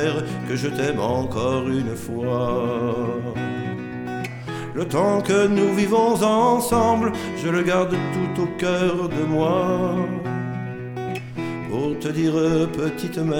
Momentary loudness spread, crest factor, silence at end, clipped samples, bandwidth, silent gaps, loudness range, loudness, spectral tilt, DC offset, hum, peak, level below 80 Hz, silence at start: 11 LU; 16 dB; 0 s; under 0.1%; 19 kHz; none; 5 LU; -22 LUFS; -6 dB/octave; under 0.1%; none; -6 dBFS; -48 dBFS; 0 s